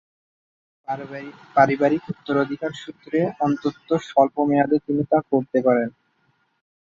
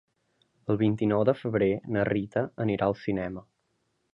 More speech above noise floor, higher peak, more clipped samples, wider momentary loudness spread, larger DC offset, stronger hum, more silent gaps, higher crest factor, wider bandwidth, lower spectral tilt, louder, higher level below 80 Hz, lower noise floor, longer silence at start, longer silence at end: about the same, 45 dB vs 48 dB; first, -2 dBFS vs -10 dBFS; neither; first, 12 LU vs 8 LU; neither; neither; neither; about the same, 20 dB vs 18 dB; about the same, 7.6 kHz vs 7 kHz; second, -7.5 dB/octave vs -9.5 dB/octave; first, -22 LUFS vs -28 LUFS; second, -64 dBFS vs -58 dBFS; second, -66 dBFS vs -75 dBFS; first, 0.9 s vs 0.7 s; first, 0.9 s vs 0.75 s